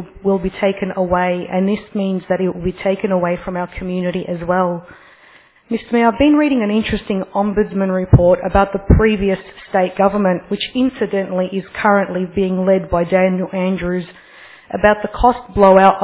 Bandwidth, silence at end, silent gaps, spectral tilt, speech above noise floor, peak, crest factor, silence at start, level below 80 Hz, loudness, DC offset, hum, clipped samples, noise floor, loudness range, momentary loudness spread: 4 kHz; 0 s; none; -11 dB/octave; 32 dB; 0 dBFS; 16 dB; 0 s; -32 dBFS; -16 LUFS; under 0.1%; none; under 0.1%; -48 dBFS; 5 LU; 9 LU